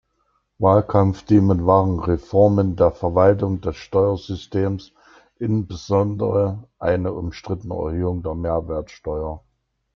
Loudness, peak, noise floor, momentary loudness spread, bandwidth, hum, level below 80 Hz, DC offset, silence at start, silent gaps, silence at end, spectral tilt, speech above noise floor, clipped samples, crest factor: -20 LUFS; -2 dBFS; -68 dBFS; 12 LU; 6.8 kHz; none; -44 dBFS; under 0.1%; 0.6 s; none; 0.55 s; -9 dB/octave; 48 dB; under 0.1%; 18 dB